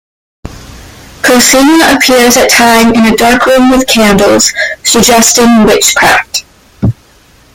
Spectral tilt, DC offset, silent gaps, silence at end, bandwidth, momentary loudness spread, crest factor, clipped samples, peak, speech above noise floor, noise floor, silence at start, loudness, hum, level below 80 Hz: -2.5 dB/octave; under 0.1%; none; 0.65 s; over 20 kHz; 9 LU; 6 dB; 0.8%; 0 dBFS; 36 dB; -41 dBFS; 0.45 s; -5 LUFS; none; -32 dBFS